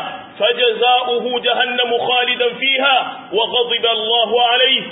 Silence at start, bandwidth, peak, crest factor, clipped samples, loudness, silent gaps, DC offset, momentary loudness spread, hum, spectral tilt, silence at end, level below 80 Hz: 0 s; 4 kHz; -2 dBFS; 14 dB; under 0.1%; -15 LUFS; none; under 0.1%; 6 LU; none; -7.5 dB/octave; 0 s; -68 dBFS